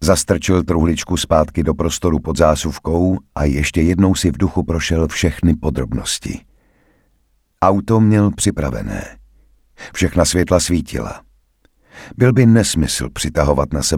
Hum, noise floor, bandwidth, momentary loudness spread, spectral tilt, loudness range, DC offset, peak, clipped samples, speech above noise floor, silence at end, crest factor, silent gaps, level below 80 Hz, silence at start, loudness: none; -61 dBFS; 17 kHz; 11 LU; -5.5 dB/octave; 3 LU; under 0.1%; 0 dBFS; under 0.1%; 45 dB; 0 s; 16 dB; none; -28 dBFS; 0 s; -16 LUFS